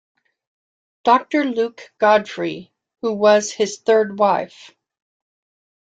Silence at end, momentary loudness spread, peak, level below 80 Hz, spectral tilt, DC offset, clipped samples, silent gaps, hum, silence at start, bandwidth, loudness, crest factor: 1.35 s; 11 LU; -2 dBFS; -68 dBFS; -4 dB/octave; under 0.1%; under 0.1%; none; none; 1.05 s; 9 kHz; -18 LUFS; 18 dB